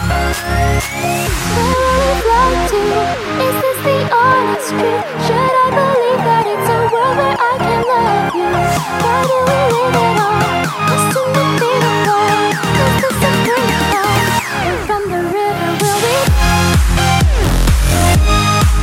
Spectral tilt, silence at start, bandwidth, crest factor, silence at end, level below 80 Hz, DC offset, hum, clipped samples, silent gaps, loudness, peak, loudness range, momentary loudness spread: -4.5 dB/octave; 0 s; 16.5 kHz; 12 dB; 0 s; -22 dBFS; under 0.1%; none; under 0.1%; none; -13 LUFS; 0 dBFS; 1 LU; 4 LU